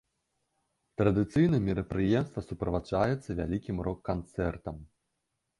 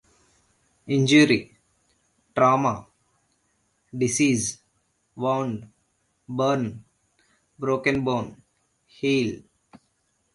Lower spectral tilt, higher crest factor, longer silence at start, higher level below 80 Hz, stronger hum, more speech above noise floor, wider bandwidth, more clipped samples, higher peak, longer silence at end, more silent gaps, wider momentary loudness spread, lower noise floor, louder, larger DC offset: first, -8.5 dB/octave vs -4.5 dB/octave; about the same, 20 dB vs 20 dB; first, 1 s vs 0.85 s; first, -48 dBFS vs -60 dBFS; neither; first, 53 dB vs 48 dB; about the same, 11.5 kHz vs 11.5 kHz; neither; second, -12 dBFS vs -6 dBFS; second, 0.75 s vs 0.95 s; neither; second, 11 LU vs 18 LU; first, -82 dBFS vs -71 dBFS; second, -30 LUFS vs -23 LUFS; neither